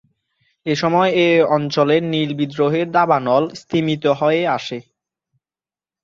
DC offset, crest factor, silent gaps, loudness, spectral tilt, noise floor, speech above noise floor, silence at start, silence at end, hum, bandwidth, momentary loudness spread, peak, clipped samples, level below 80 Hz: under 0.1%; 16 dB; none; -17 LUFS; -6.5 dB/octave; under -90 dBFS; over 73 dB; 0.65 s; 1.2 s; none; 7.6 kHz; 8 LU; -2 dBFS; under 0.1%; -62 dBFS